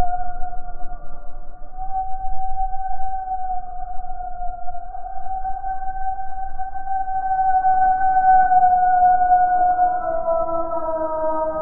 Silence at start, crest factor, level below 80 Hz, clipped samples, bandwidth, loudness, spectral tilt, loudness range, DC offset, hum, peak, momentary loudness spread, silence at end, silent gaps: 0 s; 12 dB; -32 dBFS; under 0.1%; 1.7 kHz; -20 LUFS; -12 dB/octave; 13 LU; under 0.1%; none; -6 dBFS; 18 LU; 0 s; none